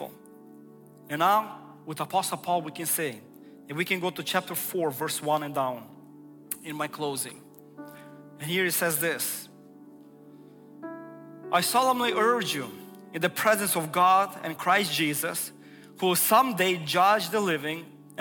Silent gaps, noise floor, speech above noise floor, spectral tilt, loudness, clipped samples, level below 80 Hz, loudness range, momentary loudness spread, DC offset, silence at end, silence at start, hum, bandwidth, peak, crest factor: none; -50 dBFS; 24 dB; -3 dB/octave; -26 LUFS; under 0.1%; -76 dBFS; 7 LU; 20 LU; under 0.1%; 0 s; 0 s; none; 18 kHz; -8 dBFS; 20 dB